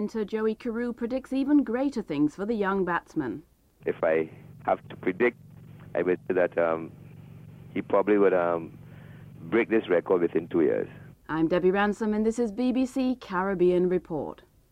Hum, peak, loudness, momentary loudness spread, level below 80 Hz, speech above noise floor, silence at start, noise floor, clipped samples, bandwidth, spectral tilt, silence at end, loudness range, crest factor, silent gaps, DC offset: none; -10 dBFS; -27 LUFS; 14 LU; -58 dBFS; 21 dB; 0 s; -47 dBFS; under 0.1%; 10.5 kHz; -7.5 dB/octave; 0.4 s; 3 LU; 16 dB; none; under 0.1%